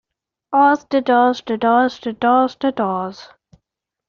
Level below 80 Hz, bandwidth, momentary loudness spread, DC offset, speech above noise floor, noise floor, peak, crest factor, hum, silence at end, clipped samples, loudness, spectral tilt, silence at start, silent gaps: -62 dBFS; 7.2 kHz; 7 LU; under 0.1%; 62 dB; -78 dBFS; -4 dBFS; 16 dB; none; 0.85 s; under 0.1%; -17 LUFS; -3 dB/octave; 0.5 s; none